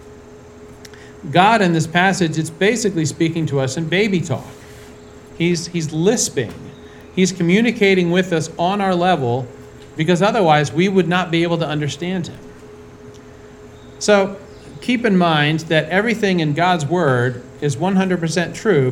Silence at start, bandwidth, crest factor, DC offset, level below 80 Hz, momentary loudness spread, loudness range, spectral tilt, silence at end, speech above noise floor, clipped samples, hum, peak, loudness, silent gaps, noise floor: 0 s; 13.5 kHz; 18 dB; under 0.1%; -50 dBFS; 12 LU; 4 LU; -5 dB/octave; 0 s; 23 dB; under 0.1%; none; 0 dBFS; -17 LUFS; none; -40 dBFS